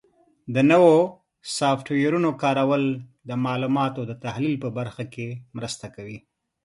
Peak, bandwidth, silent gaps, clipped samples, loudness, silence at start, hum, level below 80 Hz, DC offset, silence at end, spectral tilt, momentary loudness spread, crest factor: -4 dBFS; 11.5 kHz; none; under 0.1%; -23 LUFS; 0.45 s; none; -64 dBFS; under 0.1%; 0.45 s; -6 dB/octave; 17 LU; 20 dB